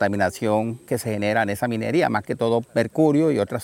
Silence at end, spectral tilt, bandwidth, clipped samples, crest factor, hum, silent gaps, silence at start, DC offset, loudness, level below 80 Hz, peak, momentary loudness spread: 0 s; -6.5 dB/octave; 17 kHz; under 0.1%; 16 dB; none; none; 0 s; under 0.1%; -22 LUFS; -58 dBFS; -6 dBFS; 6 LU